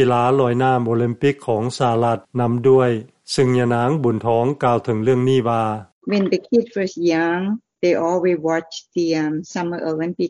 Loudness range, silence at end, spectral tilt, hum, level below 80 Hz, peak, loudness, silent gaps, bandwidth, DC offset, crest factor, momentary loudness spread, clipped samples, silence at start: 2 LU; 0 s; -7 dB/octave; none; -58 dBFS; -4 dBFS; -19 LUFS; 5.92-6.01 s; 11.5 kHz; under 0.1%; 14 dB; 8 LU; under 0.1%; 0 s